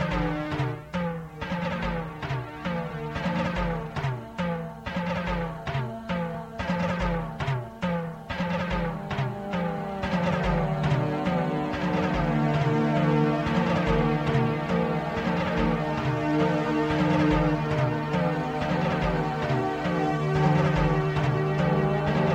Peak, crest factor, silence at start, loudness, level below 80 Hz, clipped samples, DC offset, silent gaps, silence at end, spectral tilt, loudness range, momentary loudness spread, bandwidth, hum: -10 dBFS; 16 dB; 0 s; -27 LUFS; -40 dBFS; under 0.1%; under 0.1%; none; 0 s; -7.5 dB/octave; 6 LU; 8 LU; 8.4 kHz; none